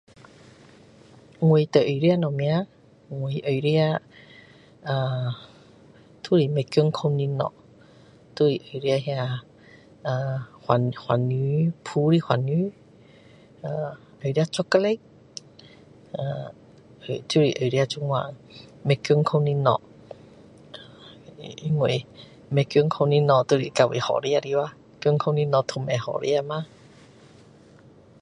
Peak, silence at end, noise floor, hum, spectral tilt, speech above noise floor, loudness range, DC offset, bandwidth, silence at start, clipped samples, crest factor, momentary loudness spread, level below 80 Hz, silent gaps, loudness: -4 dBFS; 1.55 s; -52 dBFS; none; -7 dB/octave; 29 dB; 5 LU; under 0.1%; 10.5 kHz; 1.4 s; under 0.1%; 22 dB; 17 LU; -64 dBFS; none; -24 LUFS